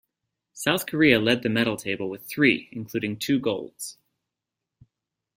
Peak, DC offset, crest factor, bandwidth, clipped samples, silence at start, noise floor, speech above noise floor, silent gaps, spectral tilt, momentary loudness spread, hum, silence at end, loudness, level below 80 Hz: -4 dBFS; under 0.1%; 22 dB; 16.5 kHz; under 0.1%; 0.55 s; -86 dBFS; 62 dB; none; -4.5 dB/octave; 13 LU; none; 1.45 s; -24 LUFS; -62 dBFS